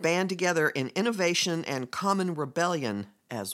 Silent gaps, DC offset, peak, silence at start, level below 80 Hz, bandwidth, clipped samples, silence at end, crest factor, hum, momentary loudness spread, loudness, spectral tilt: none; under 0.1%; -10 dBFS; 0 s; -78 dBFS; 16.5 kHz; under 0.1%; 0 s; 18 dB; none; 8 LU; -28 LUFS; -4 dB/octave